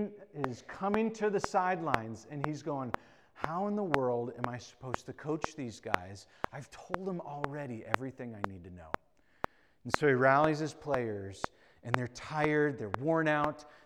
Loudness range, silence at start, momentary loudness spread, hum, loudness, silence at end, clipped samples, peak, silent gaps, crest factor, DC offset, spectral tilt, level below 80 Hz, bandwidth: 8 LU; 0 s; 14 LU; none; -34 LUFS; 0.1 s; under 0.1%; -4 dBFS; none; 30 dB; under 0.1%; -6 dB/octave; -60 dBFS; over 20 kHz